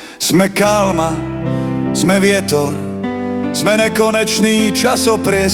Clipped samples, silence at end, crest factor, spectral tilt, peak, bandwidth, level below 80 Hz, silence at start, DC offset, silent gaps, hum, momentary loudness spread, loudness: under 0.1%; 0 s; 14 dB; -4.5 dB/octave; 0 dBFS; 18 kHz; -40 dBFS; 0 s; under 0.1%; none; none; 8 LU; -14 LUFS